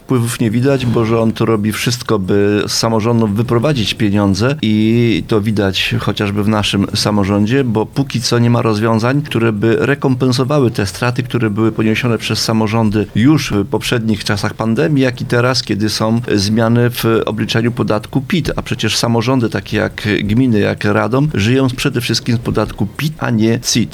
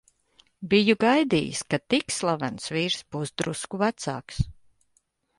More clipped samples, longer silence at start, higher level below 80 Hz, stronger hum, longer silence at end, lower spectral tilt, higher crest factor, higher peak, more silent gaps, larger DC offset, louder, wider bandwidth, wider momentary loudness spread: neither; second, 0.1 s vs 0.6 s; first, -40 dBFS vs -48 dBFS; neither; second, 0 s vs 0.85 s; about the same, -5.5 dB/octave vs -4.5 dB/octave; second, 14 dB vs 20 dB; first, 0 dBFS vs -8 dBFS; neither; neither; first, -14 LUFS vs -25 LUFS; first, 16 kHz vs 11.5 kHz; second, 4 LU vs 12 LU